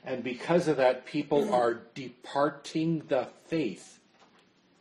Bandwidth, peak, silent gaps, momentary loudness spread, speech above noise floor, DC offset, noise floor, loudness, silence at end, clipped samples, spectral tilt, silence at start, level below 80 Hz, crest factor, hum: 12 kHz; -12 dBFS; none; 11 LU; 34 dB; under 0.1%; -64 dBFS; -29 LUFS; 0.9 s; under 0.1%; -6 dB/octave; 0.05 s; -72 dBFS; 18 dB; none